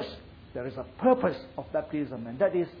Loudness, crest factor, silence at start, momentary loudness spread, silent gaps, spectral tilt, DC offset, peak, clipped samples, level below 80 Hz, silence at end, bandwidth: -30 LUFS; 20 dB; 0 s; 15 LU; none; -9 dB/octave; under 0.1%; -10 dBFS; under 0.1%; -56 dBFS; 0 s; 5.2 kHz